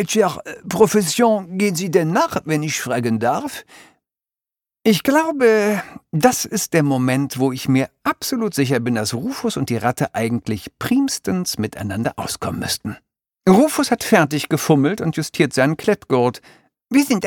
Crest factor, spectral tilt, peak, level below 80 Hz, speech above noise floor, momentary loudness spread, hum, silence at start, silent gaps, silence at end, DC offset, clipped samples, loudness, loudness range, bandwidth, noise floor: 18 dB; -5 dB/octave; -2 dBFS; -54 dBFS; over 72 dB; 9 LU; none; 0 s; none; 0 s; under 0.1%; under 0.1%; -19 LUFS; 4 LU; 19 kHz; under -90 dBFS